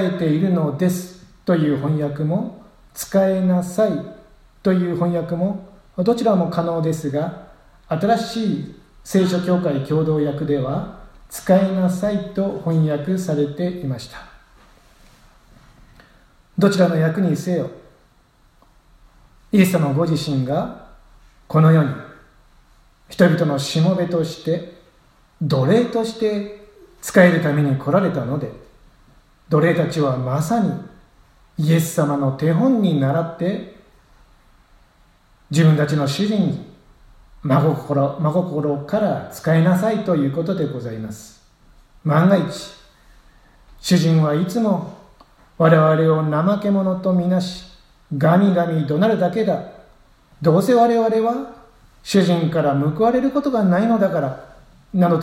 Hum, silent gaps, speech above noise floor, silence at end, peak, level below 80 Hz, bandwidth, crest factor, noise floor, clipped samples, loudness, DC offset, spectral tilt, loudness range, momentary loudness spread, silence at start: none; none; 37 dB; 0 s; 0 dBFS; -52 dBFS; 15.5 kHz; 20 dB; -55 dBFS; under 0.1%; -19 LUFS; under 0.1%; -7 dB/octave; 4 LU; 14 LU; 0 s